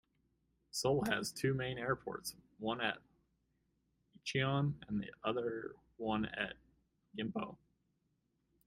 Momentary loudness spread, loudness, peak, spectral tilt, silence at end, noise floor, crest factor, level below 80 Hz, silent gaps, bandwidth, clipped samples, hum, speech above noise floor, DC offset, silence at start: 12 LU; -39 LUFS; -18 dBFS; -5 dB/octave; 1.1 s; -81 dBFS; 22 dB; -68 dBFS; none; 15.5 kHz; under 0.1%; none; 43 dB; under 0.1%; 0.75 s